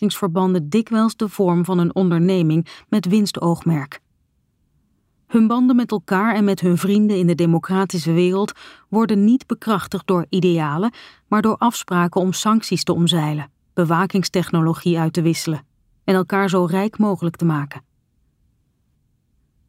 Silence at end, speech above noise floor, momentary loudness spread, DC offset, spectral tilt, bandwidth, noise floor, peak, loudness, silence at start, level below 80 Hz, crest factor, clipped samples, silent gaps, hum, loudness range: 1.9 s; 47 dB; 6 LU; under 0.1%; -6.5 dB/octave; 16 kHz; -65 dBFS; -4 dBFS; -19 LUFS; 0 s; -60 dBFS; 16 dB; under 0.1%; none; none; 4 LU